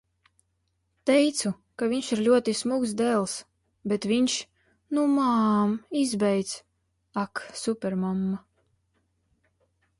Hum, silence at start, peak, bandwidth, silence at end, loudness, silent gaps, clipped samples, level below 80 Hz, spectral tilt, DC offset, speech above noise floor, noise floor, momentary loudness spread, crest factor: none; 1.05 s; -10 dBFS; 11.5 kHz; 1.6 s; -26 LUFS; none; under 0.1%; -66 dBFS; -5 dB/octave; under 0.1%; 49 dB; -74 dBFS; 11 LU; 18 dB